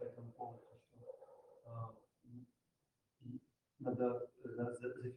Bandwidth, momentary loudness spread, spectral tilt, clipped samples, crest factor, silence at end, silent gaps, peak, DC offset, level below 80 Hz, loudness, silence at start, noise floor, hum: 10.5 kHz; 22 LU; -9 dB/octave; under 0.1%; 22 dB; 0 s; none; -24 dBFS; under 0.1%; -84 dBFS; -46 LUFS; 0 s; -87 dBFS; none